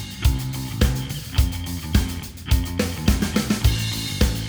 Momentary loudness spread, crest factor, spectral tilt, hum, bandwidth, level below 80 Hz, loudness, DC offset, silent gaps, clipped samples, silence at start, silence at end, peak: 7 LU; 20 dB; -5 dB/octave; none; over 20 kHz; -26 dBFS; -23 LUFS; under 0.1%; none; under 0.1%; 0 s; 0 s; -2 dBFS